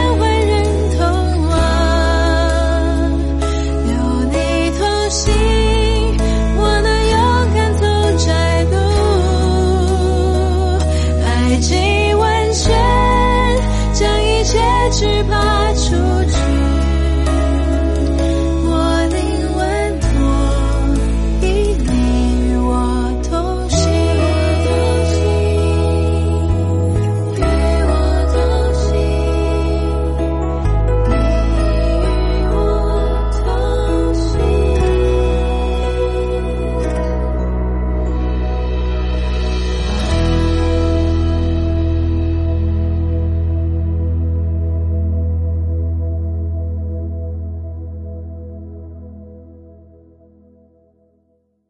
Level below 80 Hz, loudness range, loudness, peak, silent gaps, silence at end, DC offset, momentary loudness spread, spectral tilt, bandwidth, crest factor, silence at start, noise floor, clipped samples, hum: -18 dBFS; 5 LU; -16 LUFS; -2 dBFS; none; 2.15 s; under 0.1%; 6 LU; -6 dB/octave; 11.5 kHz; 12 dB; 0 s; -61 dBFS; under 0.1%; none